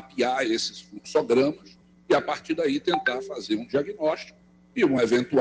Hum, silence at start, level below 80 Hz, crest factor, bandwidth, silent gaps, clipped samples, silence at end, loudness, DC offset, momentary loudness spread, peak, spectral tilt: none; 0 s; -64 dBFS; 16 dB; 9.6 kHz; none; under 0.1%; 0 s; -25 LUFS; under 0.1%; 11 LU; -8 dBFS; -4.5 dB/octave